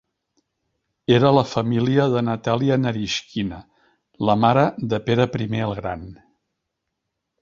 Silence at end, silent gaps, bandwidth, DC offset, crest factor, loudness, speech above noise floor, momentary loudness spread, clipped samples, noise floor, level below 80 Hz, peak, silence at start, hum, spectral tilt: 1.25 s; none; 7.6 kHz; under 0.1%; 20 dB; -20 LUFS; 59 dB; 12 LU; under 0.1%; -79 dBFS; -52 dBFS; -2 dBFS; 1.1 s; none; -6.5 dB/octave